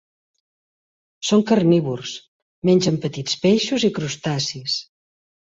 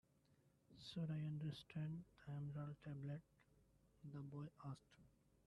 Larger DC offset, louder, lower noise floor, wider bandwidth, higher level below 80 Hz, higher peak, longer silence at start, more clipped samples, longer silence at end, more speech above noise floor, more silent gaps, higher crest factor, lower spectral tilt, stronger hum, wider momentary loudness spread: neither; first, -20 LUFS vs -52 LUFS; first, under -90 dBFS vs -78 dBFS; second, 8 kHz vs 11.5 kHz; first, -60 dBFS vs -78 dBFS; first, -4 dBFS vs -38 dBFS; first, 1.2 s vs 0.7 s; neither; first, 0.75 s vs 0.35 s; first, over 71 dB vs 27 dB; first, 2.28-2.62 s vs none; about the same, 18 dB vs 14 dB; second, -5 dB/octave vs -7.5 dB/octave; neither; about the same, 11 LU vs 10 LU